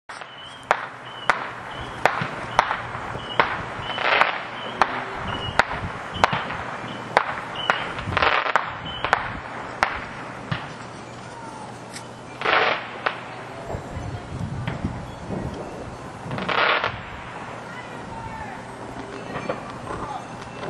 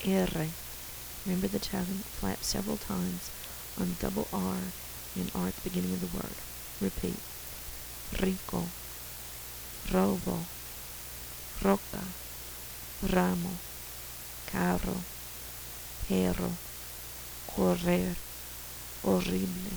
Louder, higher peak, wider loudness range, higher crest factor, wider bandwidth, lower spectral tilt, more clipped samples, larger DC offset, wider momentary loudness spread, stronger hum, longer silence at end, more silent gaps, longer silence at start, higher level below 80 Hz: first, -26 LUFS vs -34 LUFS; first, 0 dBFS vs -10 dBFS; first, 8 LU vs 3 LU; about the same, 26 dB vs 24 dB; second, 12.5 kHz vs over 20 kHz; about the same, -4.5 dB/octave vs -5 dB/octave; neither; neither; first, 16 LU vs 11 LU; neither; about the same, 0 s vs 0 s; neither; about the same, 0.1 s vs 0 s; about the same, -46 dBFS vs -48 dBFS